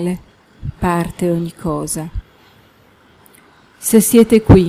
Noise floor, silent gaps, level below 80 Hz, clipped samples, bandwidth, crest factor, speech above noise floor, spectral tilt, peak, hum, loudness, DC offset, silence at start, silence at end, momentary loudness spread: -49 dBFS; none; -32 dBFS; under 0.1%; 16.5 kHz; 16 dB; 36 dB; -6 dB/octave; 0 dBFS; none; -15 LUFS; under 0.1%; 0 s; 0 s; 20 LU